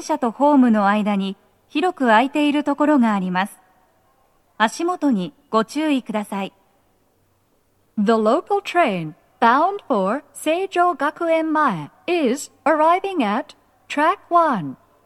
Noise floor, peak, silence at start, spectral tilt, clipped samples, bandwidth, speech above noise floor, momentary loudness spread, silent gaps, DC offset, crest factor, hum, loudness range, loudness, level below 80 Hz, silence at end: -63 dBFS; 0 dBFS; 0 s; -5.5 dB/octave; under 0.1%; 13.5 kHz; 44 dB; 12 LU; none; under 0.1%; 20 dB; none; 5 LU; -19 LUFS; -70 dBFS; 0.3 s